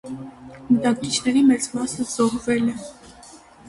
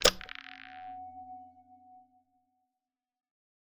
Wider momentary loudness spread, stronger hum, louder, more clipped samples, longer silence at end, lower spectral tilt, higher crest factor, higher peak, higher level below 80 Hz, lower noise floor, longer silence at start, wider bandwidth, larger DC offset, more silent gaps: first, 19 LU vs 16 LU; neither; first, -21 LUFS vs -37 LUFS; neither; second, 0 s vs 1.75 s; first, -4 dB/octave vs -0.5 dB/octave; second, 16 dB vs 32 dB; about the same, -6 dBFS vs -6 dBFS; about the same, -54 dBFS vs -54 dBFS; second, -46 dBFS vs under -90 dBFS; about the same, 0.05 s vs 0 s; second, 11.5 kHz vs 13.5 kHz; neither; neither